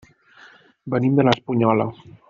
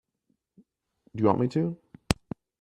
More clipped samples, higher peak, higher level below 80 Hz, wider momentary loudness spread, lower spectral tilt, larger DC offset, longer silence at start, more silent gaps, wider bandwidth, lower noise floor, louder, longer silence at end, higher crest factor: neither; about the same, -2 dBFS vs -4 dBFS; second, -58 dBFS vs -52 dBFS; second, 11 LU vs 19 LU; about the same, -6 dB/octave vs -6.5 dB/octave; neither; second, 0.85 s vs 1.15 s; neither; second, 7.4 kHz vs 13 kHz; second, -50 dBFS vs -76 dBFS; first, -20 LUFS vs -28 LUFS; about the same, 0.35 s vs 0.45 s; second, 18 dB vs 26 dB